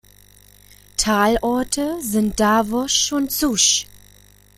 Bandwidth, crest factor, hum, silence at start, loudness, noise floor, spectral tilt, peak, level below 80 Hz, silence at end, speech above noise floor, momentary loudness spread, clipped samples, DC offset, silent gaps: 16.5 kHz; 18 dB; 50 Hz at -45 dBFS; 1 s; -18 LUFS; -50 dBFS; -2.5 dB/octave; -2 dBFS; -42 dBFS; 0.6 s; 31 dB; 7 LU; under 0.1%; under 0.1%; none